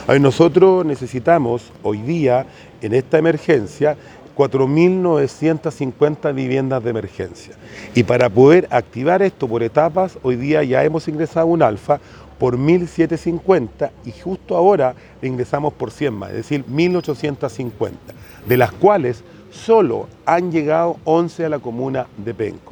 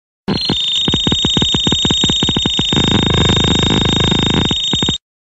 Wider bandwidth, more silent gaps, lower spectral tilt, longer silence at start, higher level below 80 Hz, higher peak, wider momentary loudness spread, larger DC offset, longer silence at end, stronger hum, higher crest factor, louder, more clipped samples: first, 19 kHz vs 9.8 kHz; neither; first, -7.5 dB/octave vs -4 dB/octave; second, 0 s vs 0.3 s; second, -50 dBFS vs -28 dBFS; about the same, 0 dBFS vs 0 dBFS; first, 12 LU vs 3 LU; neither; about the same, 0.15 s vs 0.25 s; neither; about the same, 16 dB vs 14 dB; second, -17 LUFS vs -12 LUFS; neither